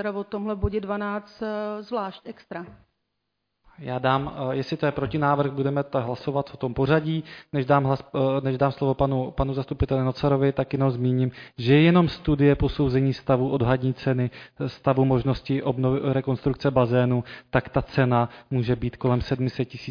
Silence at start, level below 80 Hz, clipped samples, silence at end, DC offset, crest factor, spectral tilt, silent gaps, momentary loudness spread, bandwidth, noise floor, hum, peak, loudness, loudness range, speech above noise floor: 0 s; -42 dBFS; under 0.1%; 0 s; under 0.1%; 16 dB; -9 dB/octave; none; 9 LU; 5.2 kHz; -78 dBFS; none; -6 dBFS; -24 LUFS; 9 LU; 54 dB